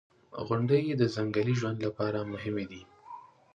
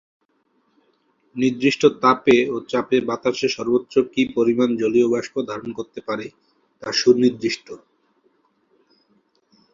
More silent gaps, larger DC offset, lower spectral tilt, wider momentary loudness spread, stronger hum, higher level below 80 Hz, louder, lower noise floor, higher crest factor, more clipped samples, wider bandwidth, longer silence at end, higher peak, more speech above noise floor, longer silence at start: neither; neither; first, -7.5 dB/octave vs -5 dB/octave; first, 21 LU vs 14 LU; neither; about the same, -64 dBFS vs -62 dBFS; second, -30 LUFS vs -20 LUFS; second, -50 dBFS vs -66 dBFS; about the same, 18 dB vs 20 dB; neither; about the same, 7.8 kHz vs 7.6 kHz; second, 0.35 s vs 1.95 s; second, -14 dBFS vs -2 dBFS; second, 20 dB vs 46 dB; second, 0.3 s vs 1.35 s